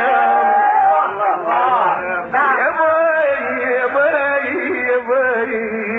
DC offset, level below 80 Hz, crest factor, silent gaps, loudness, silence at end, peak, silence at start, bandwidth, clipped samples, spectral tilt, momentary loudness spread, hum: under 0.1%; -60 dBFS; 10 dB; none; -16 LUFS; 0 s; -4 dBFS; 0 s; 4 kHz; under 0.1%; -6.5 dB/octave; 5 LU; none